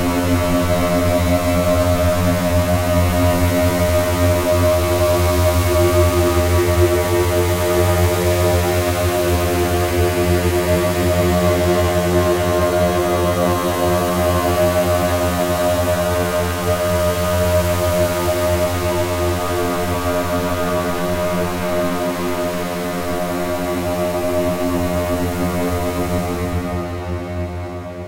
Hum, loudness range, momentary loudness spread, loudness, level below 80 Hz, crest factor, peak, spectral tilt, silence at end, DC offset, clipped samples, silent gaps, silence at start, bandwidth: none; 5 LU; 5 LU; -17 LUFS; -30 dBFS; 14 dB; -2 dBFS; -5.5 dB/octave; 0 s; under 0.1%; under 0.1%; none; 0 s; 16 kHz